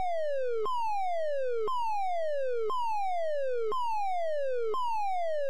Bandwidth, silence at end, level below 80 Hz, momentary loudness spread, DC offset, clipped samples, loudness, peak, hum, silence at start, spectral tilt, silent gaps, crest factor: 15.5 kHz; 0 s; -72 dBFS; 0 LU; 2%; under 0.1%; -32 LUFS; -22 dBFS; none; 0 s; -3.5 dB/octave; none; 6 dB